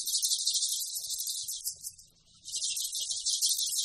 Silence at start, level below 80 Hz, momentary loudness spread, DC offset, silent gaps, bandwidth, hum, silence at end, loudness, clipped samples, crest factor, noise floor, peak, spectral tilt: 0 s; -72 dBFS; 11 LU; under 0.1%; none; 14.5 kHz; none; 0 s; -30 LUFS; under 0.1%; 20 dB; -59 dBFS; -14 dBFS; 4.5 dB/octave